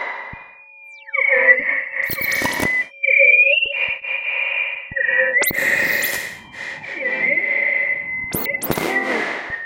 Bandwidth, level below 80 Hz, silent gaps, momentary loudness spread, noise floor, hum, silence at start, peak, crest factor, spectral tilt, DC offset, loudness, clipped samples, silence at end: 17 kHz; -52 dBFS; none; 14 LU; -42 dBFS; none; 0 s; 0 dBFS; 20 dB; -2.5 dB/octave; under 0.1%; -17 LUFS; under 0.1%; 0 s